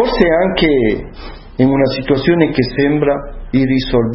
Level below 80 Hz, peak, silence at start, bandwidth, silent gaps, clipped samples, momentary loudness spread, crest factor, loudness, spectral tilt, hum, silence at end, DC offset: -30 dBFS; 0 dBFS; 0 s; 6 kHz; none; under 0.1%; 10 LU; 14 dB; -14 LUFS; -9 dB/octave; none; 0 s; under 0.1%